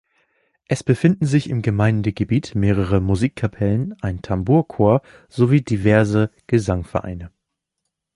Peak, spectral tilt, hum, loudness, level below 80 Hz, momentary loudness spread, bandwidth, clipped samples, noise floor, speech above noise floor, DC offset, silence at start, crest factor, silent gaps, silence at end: -2 dBFS; -8 dB/octave; none; -19 LUFS; -38 dBFS; 10 LU; 11.5 kHz; under 0.1%; -79 dBFS; 60 dB; under 0.1%; 0.7 s; 18 dB; none; 0.85 s